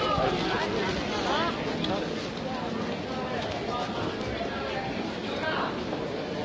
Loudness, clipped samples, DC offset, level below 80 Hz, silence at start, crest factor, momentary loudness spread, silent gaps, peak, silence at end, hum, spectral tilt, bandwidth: -30 LUFS; under 0.1%; under 0.1%; -48 dBFS; 0 s; 18 dB; 6 LU; none; -12 dBFS; 0 s; none; -5 dB/octave; 8 kHz